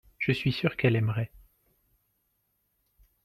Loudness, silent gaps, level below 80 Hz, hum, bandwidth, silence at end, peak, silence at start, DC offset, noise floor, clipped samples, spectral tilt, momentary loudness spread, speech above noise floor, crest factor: -28 LUFS; none; -58 dBFS; none; 13.5 kHz; 1.85 s; -10 dBFS; 0.2 s; under 0.1%; -76 dBFS; under 0.1%; -8 dB/octave; 8 LU; 49 dB; 22 dB